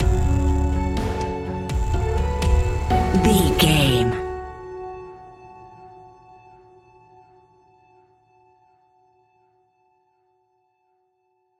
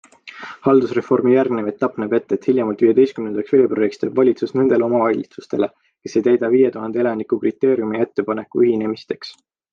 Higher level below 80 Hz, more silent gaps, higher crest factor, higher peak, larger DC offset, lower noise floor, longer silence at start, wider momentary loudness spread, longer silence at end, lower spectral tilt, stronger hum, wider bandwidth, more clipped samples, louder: first, -28 dBFS vs -64 dBFS; neither; first, 22 dB vs 16 dB; about the same, -2 dBFS vs -2 dBFS; neither; first, -69 dBFS vs -37 dBFS; second, 0 s vs 0.25 s; first, 26 LU vs 9 LU; first, 5.55 s vs 0.4 s; second, -5.5 dB/octave vs -7.5 dB/octave; neither; first, 16 kHz vs 7 kHz; neither; second, -21 LUFS vs -18 LUFS